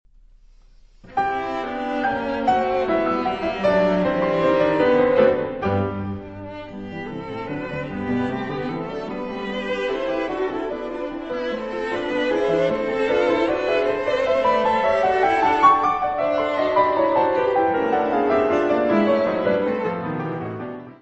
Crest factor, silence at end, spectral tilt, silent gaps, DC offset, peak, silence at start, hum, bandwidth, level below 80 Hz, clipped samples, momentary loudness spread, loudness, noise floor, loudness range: 18 dB; 0.05 s; -7 dB/octave; none; under 0.1%; -4 dBFS; 1.05 s; none; 8.2 kHz; -48 dBFS; under 0.1%; 11 LU; -21 LUFS; -50 dBFS; 8 LU